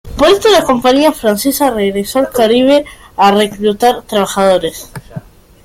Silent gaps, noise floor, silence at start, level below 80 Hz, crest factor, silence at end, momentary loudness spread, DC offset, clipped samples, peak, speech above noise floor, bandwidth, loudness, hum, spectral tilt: none; -31 dBFS; 0.05 s; -38 dBFS; 12 dB; 0.45 s; 16 LU; under 0.1%; under 0.1%; 0 dBFS; 20 dB; 16.5 kHz; -11 LUFS; none; -4 dB/octave